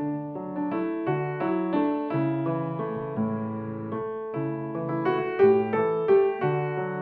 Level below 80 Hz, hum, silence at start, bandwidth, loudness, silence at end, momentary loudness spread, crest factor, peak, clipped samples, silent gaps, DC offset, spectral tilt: -66 dBFS; none; 0 s; 4.5 kHz; -27 LUFS; 0 s; 11 LU; 16 dB; -10 dBFS; under 0.1%; none; under 0.1%; -11 dB/octave